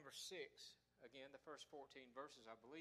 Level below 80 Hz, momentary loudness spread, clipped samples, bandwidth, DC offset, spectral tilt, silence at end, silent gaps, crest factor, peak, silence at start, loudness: under -90 dBFS; 9 LU; under 0.1%; 14.5 kHz; under 0.1%; -2 dB/octave; 0 s; none; 18 dB; -40 dBFS; 0 s; -59 LUFS